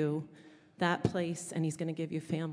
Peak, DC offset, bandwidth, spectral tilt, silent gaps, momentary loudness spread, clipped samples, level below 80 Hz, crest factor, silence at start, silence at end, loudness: -14 dBFS; under 0.1%; 11 kHz; -6 dB/octave; none; 7 LU; under 0.1%; -66 dBFS; 20 dB; 0 s; 0 s; -35 LUFS